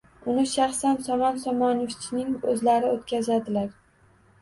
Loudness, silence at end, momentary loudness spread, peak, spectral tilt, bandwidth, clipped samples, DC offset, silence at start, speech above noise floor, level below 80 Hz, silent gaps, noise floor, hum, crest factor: -25 LUFS; 0.7 s; 7 LU; -10 dBFS; -4.5 dB/octave; 11.5 kHz; under 0.1%; under 0.1%; 0.25 s; 35 dB; -60 dBFS; none; -59 dBFS; none; 16 dB